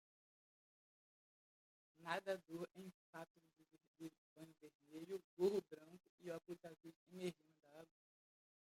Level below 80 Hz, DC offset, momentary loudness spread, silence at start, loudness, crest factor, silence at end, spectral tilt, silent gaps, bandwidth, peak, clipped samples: under -90 dBFS; under 0.1%; 23 LU; 2 s; -50 LUFS; 24 dB; 0.9 s; -5.5 dB/octave; 2.94-3.13 s, 3.30-3.35 s, 3.87-3.94 s, 4.18-4.36 s, 4.75-4.80 s, 5.24-5.37 s, 6.09-6.18 s, 6.96-7.06 s; 16 kHz; -28 dBFS; under 0.1%